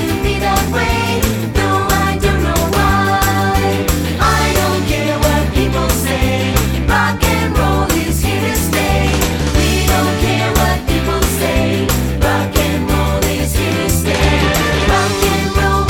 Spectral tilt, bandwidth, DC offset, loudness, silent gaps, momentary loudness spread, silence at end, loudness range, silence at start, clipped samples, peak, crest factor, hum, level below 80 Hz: -4.5 dB/octave; 19 kHz; under 0.1%; -14 LUFS; none; 3 LU; 0 s; 1 LU; 0 s; under 0.1%; 0 dBFS; 14 dB; none; -20 dBFS